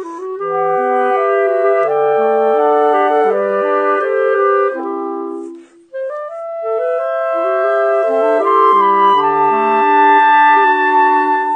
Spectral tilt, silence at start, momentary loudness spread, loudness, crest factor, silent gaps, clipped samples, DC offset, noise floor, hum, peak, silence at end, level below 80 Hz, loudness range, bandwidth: -5.5 dB/octave; 0 s; 14 LU; -13 LUFS; 12 dB; none; under 0.1%; under 0.1%; -34 dBFS; none; 0 dBFS; 0 s; -74 dBFS; 8 LU; 8.8 kHz